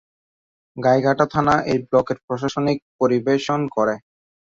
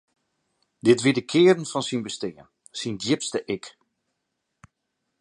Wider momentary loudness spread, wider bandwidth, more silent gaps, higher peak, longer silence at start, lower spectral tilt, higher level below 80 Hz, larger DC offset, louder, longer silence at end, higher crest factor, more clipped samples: second, 8 LU vs 14 LU; second, 7.8 kHz vs 11 kHz; first, 2.23-2.28 s, 2.82-2.99 s vs none; about the same, -2 dBFS vs -4 dBFS; about the same, 0.75 s vs 0.85 s; first, -6.5 dB/octave vs -4.5 dB/octave; first, -54 dBFS vs -68 dBFS; neither; first, -20 LUFS vs -23 LUFS; second, 0.5 s vs 1.5 s; about the same, 18 dB vs 22 dB; neither